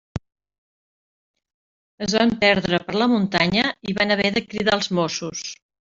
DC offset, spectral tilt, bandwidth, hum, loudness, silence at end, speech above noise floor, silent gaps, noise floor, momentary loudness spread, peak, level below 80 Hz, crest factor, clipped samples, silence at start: under 0.1%; -4.5 dB/octave; 7.8 kHz; none; -20 LUFS; 0.35 s; over 69 dB; 0.58-1.34 s, 1.54-1.98 s; under -90 dBFS; 13 LU; -4 dBFS; -52 dBFS; 20 dB; under 0.1%; 0.15 s